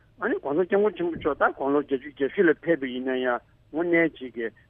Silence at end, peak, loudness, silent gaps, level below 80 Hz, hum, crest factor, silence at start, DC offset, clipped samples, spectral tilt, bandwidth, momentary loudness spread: 0.2 s; -10 dBFS; -25 LUFS; none; -60 dBFS; none; 16 dB; 0.2 s; under 0.1%; under 0.1%; -9 dB/octave; 3.7 kHz; 8 LU